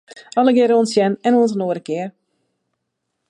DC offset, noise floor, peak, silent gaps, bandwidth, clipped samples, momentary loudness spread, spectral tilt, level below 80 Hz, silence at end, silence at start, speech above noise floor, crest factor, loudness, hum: under 0.1%; -76 dBFS; -2 dBFS; none; 11.5 kHz; under 0.1%; 12 LU; -6 dB/octave; -72 dBFS; 1.2 s; 0.15 s; 60 dB; 16 dB; -17 LUFS; none